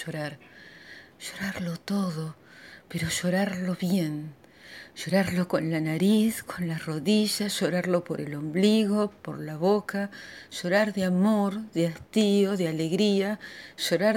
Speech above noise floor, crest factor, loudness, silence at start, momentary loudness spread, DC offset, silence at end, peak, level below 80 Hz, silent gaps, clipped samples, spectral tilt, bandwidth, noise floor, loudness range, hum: 22 dB; 18 dB; -27 LUFS; 0 s; 16 LU; under 0.1%; 0 s; -10 dBFS; -64 dBFS; none; under 0.1%; -5.5 dB/octave; 17 kHz; -49 dBFS; 5 LU; none